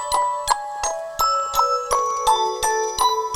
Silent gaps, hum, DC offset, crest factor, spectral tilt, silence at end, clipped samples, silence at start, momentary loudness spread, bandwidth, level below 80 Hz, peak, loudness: none; none; under 0.1%; 18 dB; -0.5 dB/octave; 0 s; under 0.1%; 0 s; 4 LU; 17.5 kHz; -46 dBFS; -4 dBFS; -21 LUFS